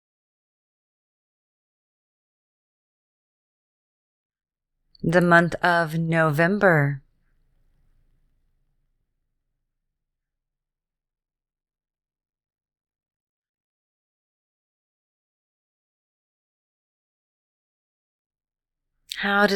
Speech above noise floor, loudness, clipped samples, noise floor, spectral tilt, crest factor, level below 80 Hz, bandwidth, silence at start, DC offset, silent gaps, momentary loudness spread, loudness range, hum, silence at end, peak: 68 dB; -20 LUFS; under 0.1%; -87 dBFS; -6.5 dB/octave; 26 dB; -60 dBFS; 15 kHz; 5.05 s; under 0.1%; 13.16-13.42 s, 13.49-13.54 s, 13.60-18.30 s; 12 LU; 9 LU; none; 0 s; -4 dBFS